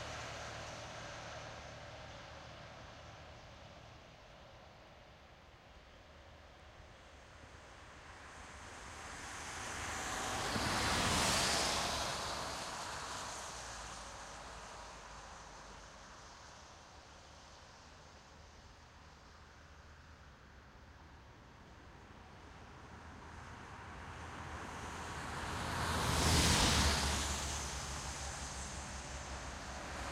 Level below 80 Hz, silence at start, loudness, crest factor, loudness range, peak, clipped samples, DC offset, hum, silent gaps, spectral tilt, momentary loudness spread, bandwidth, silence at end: -52 dBFS; 0 s; -38 LUFS; 24 dB; 23 LU; -18 dBFS; under 0.1%; under 0.1%; none; none; -2.5 dB/octave; 25 LU; 16 kHz; 0 s